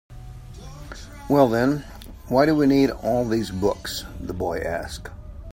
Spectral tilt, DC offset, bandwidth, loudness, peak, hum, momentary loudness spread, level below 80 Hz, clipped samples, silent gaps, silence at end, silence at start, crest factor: -6 dB/octave; under 0.1%; 16.5 kHz; -22 LUFS; -2 dBFS; none; 23 LU; -42 dBFS; under 0.1%; none; 0 s; 0.1 s; 20 dB